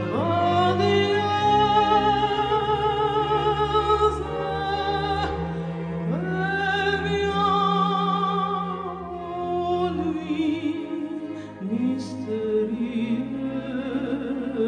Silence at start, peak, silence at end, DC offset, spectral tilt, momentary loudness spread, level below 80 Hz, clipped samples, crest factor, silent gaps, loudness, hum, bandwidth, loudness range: 0 s; -8 dBFS; 0 s; under 0.1%; -6.5 dB/octave; 10 LU; -44 dBFS; under 0.1%; 16 dB; none; -24 LUFS; none; 9.8 kHz; 6 LU